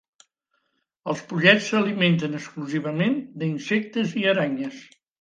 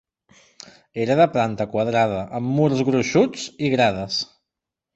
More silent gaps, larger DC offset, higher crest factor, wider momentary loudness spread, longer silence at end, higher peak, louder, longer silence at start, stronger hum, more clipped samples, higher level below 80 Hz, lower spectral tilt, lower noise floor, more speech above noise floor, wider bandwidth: neither; neither; first, 22 dB vs 16 dB; first, 14 LU vs 8 LU; second, 0.35 s vs 0.7 s; about the same, -2 dBFS vs -4 dBFS; about the same, -23 LUFS vs -21 LUFS; about the same, 1.05 s vs 0.95 s; neither; neither; second, -70 dBFS vs -56 dBFS; about the same, -5.5 dB/octave vs -5.5 dB/octave; second, -74 dBFS vs -85 dBFS; second, 50 dB vs 65 dB; first, 9.2 kHz vs 8.2 kHz